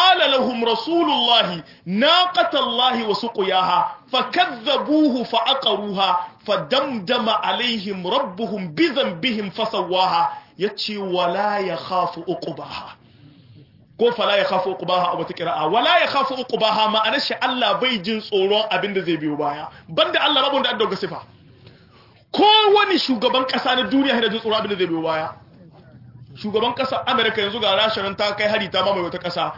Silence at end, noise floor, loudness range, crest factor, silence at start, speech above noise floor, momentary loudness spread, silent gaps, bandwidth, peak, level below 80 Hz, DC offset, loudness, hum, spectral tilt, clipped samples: 0 s; -51 dBFS; 5 LU; 18 dB; 0 s; 31 dB; 9 LU; none; 5.8 kHz; -2 dBFS; -64 dBFS; under 0.1%; -19 LUFS; none; -5 dB/octave; under 0.1%